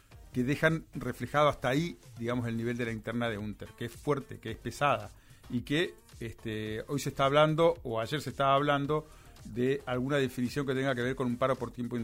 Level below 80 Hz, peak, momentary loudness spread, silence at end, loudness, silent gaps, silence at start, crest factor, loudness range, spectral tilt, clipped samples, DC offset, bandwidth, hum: -54 dBFS; -12 dBFS; 12 LU; 0 s; -31 LUFS; none; 0.1 s; 18 dB; 5 LU; -6 dB/octave; under 0.1%; under 0.1%; 16 kHz; none